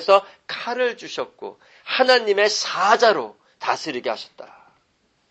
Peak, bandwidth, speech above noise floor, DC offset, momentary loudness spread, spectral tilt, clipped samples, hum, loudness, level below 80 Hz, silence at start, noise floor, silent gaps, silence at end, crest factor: -2 dBFS; 8.6 kHz; 45 dB; under 0.1%; 19 LU; -1.5 dB/octave; under 0.1%; none; -20 LUFS; -74 dBFS; 0 s; -66 dBFS; none; 0.85 s; 20 dB